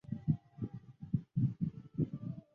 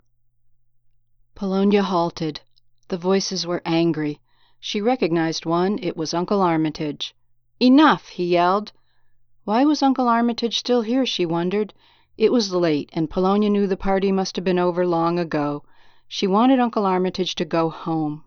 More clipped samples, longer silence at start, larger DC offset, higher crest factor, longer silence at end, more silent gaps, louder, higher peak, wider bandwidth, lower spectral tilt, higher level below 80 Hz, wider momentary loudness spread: neither; second, 0.1 s vs 1.4 s; neither; about the same, 20 dB vs 18 dB; about the same, 0.15 s vs 0.05 s; neither; second, -39 LUFS vs -21 LUFS; second, -18 dBFS vs -4 dBFS; second, 3.4 kHz vs 7 kHz; first, -12 dB/octave vs -5.5 dB/octave; second, -60 dBFS vs -52 dBFS; about the same, 10 LU vs 10 LU